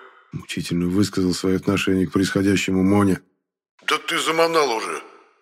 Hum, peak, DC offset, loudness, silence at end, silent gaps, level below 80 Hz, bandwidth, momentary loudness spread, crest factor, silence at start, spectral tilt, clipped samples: none; -4 dBFS; under 0.1%; -21 LUFS; 0.35 s; 3.69-3.78 s; -56 dBFS; 16 kHz; 11 LU; 18 dB; 0 s; -5 dB/octave; under 0.1%